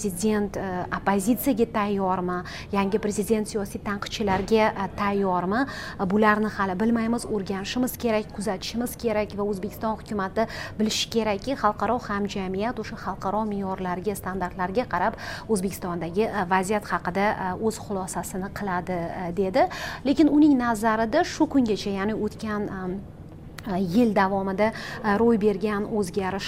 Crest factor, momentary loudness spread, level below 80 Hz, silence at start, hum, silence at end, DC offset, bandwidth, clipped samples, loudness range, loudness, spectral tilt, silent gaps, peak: 18 dB; 9 LU; -46 dBFS; 0 s; none; 0 s; under 0.1%; 16 kHz; under 0.1%; 5 LU; -25 LUFS; -5.5 dB/octave; none; -6 dBFS